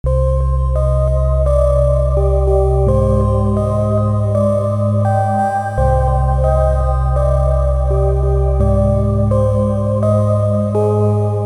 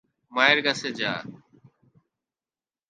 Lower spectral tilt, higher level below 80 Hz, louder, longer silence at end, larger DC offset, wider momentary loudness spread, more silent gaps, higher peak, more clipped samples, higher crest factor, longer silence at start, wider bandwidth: first, -9.5 dB/octave vs -3 dB/octave; first, -18 dBFS vs -74 dBFS; first, -15 LUFS vs -23 LUFS; second, 0 s vs 1.55 s; neither; second, 2 LU vs 15 LU; neither; about the same, -2 dBFS vs -2 dBFS; neither; second, 10 dB vs 26 dB; second, 0.05 s vs 0.3 s; about the same, 10.5 kHz vs 10 kHz